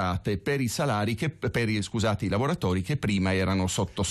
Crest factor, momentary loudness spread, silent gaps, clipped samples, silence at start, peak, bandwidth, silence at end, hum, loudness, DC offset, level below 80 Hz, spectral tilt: 10 dB; 3 LU; none; under 0.1%; 0 s; -16 dBFS; 13.5 kHz; 0 s; none; -27 LUFS; under 0.1%; -50 dBFS; -5.5 dB/octave